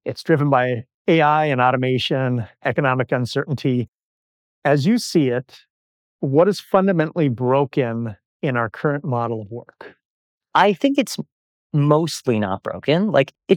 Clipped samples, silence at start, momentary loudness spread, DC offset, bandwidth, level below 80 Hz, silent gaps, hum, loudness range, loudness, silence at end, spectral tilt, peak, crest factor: under 0.1%; 0.05 s; 10 LU; under 0.1%; 17 kHz; -64 dBFS; 0.94-1.05 s, 3.88-4.62 s, 5.70-6.19 s, 8.25-8.40 s, 10.05-10.41 s, 11.32-11.70 s; none; 3 LU; -20 LUFS; 0 s; -6.5 dB/octave; -2 dBFS; 18 dB